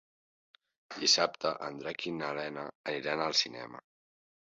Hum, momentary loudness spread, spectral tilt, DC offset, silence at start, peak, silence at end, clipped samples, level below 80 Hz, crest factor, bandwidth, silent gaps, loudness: none; 19 LU; -0.5 dB/octave; under 0.1%; 0.9 s; -12 dBFS; 0.7 s; under 0.1%; -78 dBFS; 24 dB; 7.6 kHz; 2.75-2.84 s; -32 LUFS